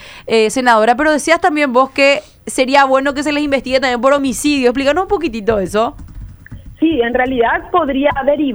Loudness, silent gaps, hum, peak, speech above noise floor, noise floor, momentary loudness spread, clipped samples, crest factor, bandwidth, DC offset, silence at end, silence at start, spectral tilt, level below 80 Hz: -14 LUFS; none; none; 0 dBFS; 20 dB; -34 dBFS; 6 LU; under 0.1%; 14 dB; over 20 kHz; under 0.1%; 0 s; 0 s; -3.5 dB/octave; -38 dBFS